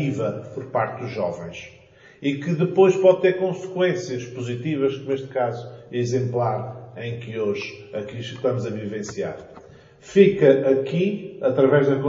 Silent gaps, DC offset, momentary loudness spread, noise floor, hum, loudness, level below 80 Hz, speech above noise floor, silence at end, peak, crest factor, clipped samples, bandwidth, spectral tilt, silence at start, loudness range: none; under 0.1%; 16 LU; -46 dBFS; none; -22 LUFS; -62 dBFS; 24 dB; 0 s; -2 dBFS; 20 dB; under 0.1%; 7.6 kHz; -6.5 dB/octave; 0 s; 6 LU